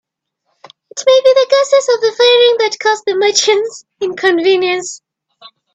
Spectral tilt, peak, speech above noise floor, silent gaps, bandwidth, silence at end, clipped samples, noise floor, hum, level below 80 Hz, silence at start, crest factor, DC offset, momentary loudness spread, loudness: -1 dB/octave; 0 dBFS; 56 dB; none; 8.6 kHz; 0.8 s; under 0.1%; -69 dBFS; none; -64 dBFS; 0.95 s; 14 dB; under 0.1%; 13 LU; -12 LUFS